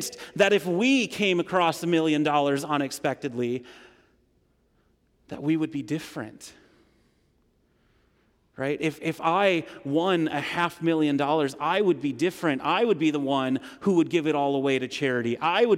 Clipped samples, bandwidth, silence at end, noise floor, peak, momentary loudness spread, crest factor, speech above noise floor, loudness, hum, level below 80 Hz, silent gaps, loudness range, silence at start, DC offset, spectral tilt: under 0.1%; 16 kHz; 0 s; -67 dBFS; -10 dBFS; 9 LU; 16 dB; 42 dB; -25 LUFS; none; -68 dBFS; none; 10 LU; 0 s; under 0.1%; -5 dB/octave